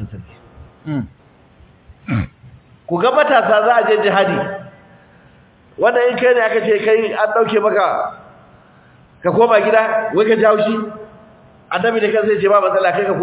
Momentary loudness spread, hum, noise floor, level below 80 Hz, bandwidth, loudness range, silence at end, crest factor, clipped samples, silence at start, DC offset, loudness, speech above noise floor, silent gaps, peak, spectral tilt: 14 LU; none; -48 dBFS; -48 dBFS; 4 kHz; 1 LU; 0 s; 16 dB; under 0.1%; 0 s; under 0.1%; -15 LUFS; 34 dB; none; 0 dBFS; -9.5 dB/octave